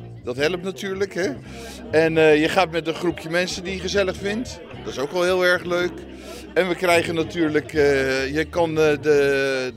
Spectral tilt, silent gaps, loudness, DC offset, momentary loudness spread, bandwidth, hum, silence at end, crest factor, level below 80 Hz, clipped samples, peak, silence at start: -4.5 dB/octave; none; -21 LUFS; under 0.1%; 13 LU; 15.5 kHz; none; 0 s; 18 dB; -46 dBFS; under 0.1%; -4 dBFS; 0 s